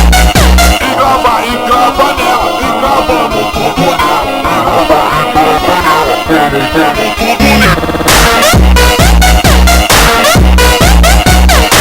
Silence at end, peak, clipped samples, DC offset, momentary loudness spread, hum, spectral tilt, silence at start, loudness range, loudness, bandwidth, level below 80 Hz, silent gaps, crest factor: 0 s; 0 dBFS; 0.2%; under 0.1%; 5 LU; none; -4 dB/octave; 0 s; 4 LU; -7 LUFS; over 20 kHz; -12 dBFS; none; 6 dB